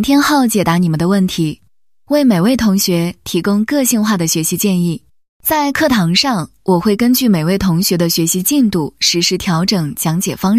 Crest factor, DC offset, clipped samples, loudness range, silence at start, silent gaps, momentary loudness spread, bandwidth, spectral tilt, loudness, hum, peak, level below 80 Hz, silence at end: 14 dB; 0.3%; under 0.1%; 2 LU; 0 s; 5.29-5.40 s; 6 LU; 15.5 kHz; -4.5 dB/octave; -14 LUFS; none; 0 dBFS; -44 dBFS; 0 s